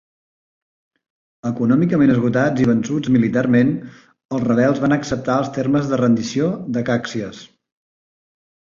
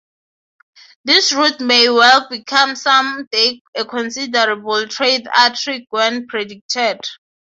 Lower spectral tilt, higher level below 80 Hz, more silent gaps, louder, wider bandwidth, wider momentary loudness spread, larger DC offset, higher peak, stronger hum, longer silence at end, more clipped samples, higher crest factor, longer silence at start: first, -7 dB/octave vs -0.5 dB/octave; first, -52 dBFS vs -68 dBFS; second, 4.25-4.29 s vs 3.27-3.31 s, 3.61-3.73 s, 6.61-6.69 s; second, -18 LUFS vs -14 LUFS; about the same, 7.4 kHz vs 8 kHz; about the same, 11 LU vs 12 LU; neither; second, -4 dBFS vs 0 dBFS; neither; first, 1.3 s vs 0.4 s; neither; about the same, 16 dB vs 16 dB; first, 1.45 s vs 1.05 s